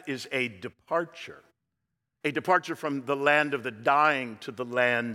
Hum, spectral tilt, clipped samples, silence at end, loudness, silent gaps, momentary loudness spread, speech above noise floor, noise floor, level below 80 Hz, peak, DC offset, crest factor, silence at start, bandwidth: none; -5 dB/octave; under 0.1%; 0 s; -27 LUFS; none; 14 LU; 55 dB; -83 dBFS; -80 dBFS; -8 dBFS; under 0.1%; 20 dB; 0.05 s; 16 kHz